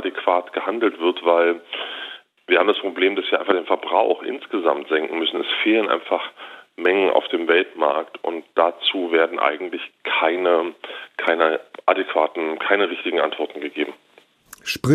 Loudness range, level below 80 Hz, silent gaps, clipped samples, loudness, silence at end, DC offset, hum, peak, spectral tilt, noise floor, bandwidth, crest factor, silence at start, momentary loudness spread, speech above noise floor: 1 LU; -66 dBFS; none; under 0.1%; -21 LUFS; 0 s; under 0.1%; none; -2 dBFS; -5 dB/octave; -48 dBFS; 14.5 kHz; 20 dB; 0 s; 11 LU; 28 dB